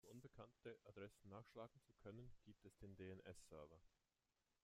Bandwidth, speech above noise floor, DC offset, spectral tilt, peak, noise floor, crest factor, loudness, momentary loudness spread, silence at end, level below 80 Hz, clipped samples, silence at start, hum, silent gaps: 15.5 kHz; over 28 dB; under 0.1%; -6 dB/octave; -44 dBFS; under -90 dBFS; 18 dB; -63 LUFS; 7 LU; 0.75 s; -78 dBFS; under 0.1%; 0.05 s; none; none